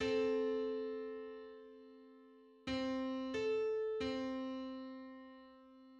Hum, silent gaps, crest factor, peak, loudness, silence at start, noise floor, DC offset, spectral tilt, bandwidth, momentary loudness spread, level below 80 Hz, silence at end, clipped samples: none; none; 14 dB; -26 dBFS; -40 LUFS; 0 s; -62 dBFS; under 0.1%; -5.5 dB/octave; 8 kHz; 22 LU; -70 dBFS; 0 s; under 0.1%